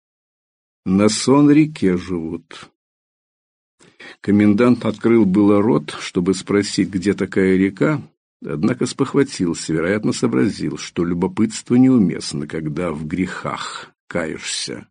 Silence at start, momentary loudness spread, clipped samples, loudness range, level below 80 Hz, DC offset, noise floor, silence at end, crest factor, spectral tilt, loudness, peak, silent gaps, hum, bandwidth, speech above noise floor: 0.85 s; 12 LU; under 0.1%; 3 LU; -52 dBFS; under 0.1%; under -90 dBFS; 0.1 s; 16 dB; -6 dB/octave; -18 LUFS; -2 dBFS; 2.75-3.78 s, 8.17-8.40 s, 14.00-14.08 s; none; 10 kHz; over 73 dB